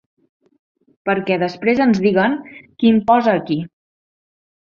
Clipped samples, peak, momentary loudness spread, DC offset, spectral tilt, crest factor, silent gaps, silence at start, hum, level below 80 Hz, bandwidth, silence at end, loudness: under 0.1%; -2 dBFS; 11 LU; under 0.1%; -7.5 dB/octave; 16 dB; none; 1.05 s; none; -58 dBFS; 7 kHz; 1.05 s; -17 LUFS